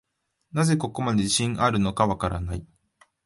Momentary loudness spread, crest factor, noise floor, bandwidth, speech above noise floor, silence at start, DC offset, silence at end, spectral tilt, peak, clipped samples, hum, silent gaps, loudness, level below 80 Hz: 10 LU; 18 dB; -67 dBFS; 11.5 kHz; 44 dB; 0.55 s; under 0.1%; 0.6 s; -5 dB/octave; -6 dBFS; under 0.1%; none; none; -24 LUFS; -44 dBFS